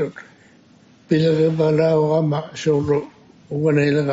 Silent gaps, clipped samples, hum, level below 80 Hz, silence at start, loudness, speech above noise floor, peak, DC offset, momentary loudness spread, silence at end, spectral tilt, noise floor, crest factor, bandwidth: none; under 0.1%; none; -56 dBFS; 0 s; -19 LUFS; 33 dB; -4 dBFS; under 0.1%; 7 LU; 0 s; -7 dB/octave; -51 dBFS; 16 dB; 7.8 kHz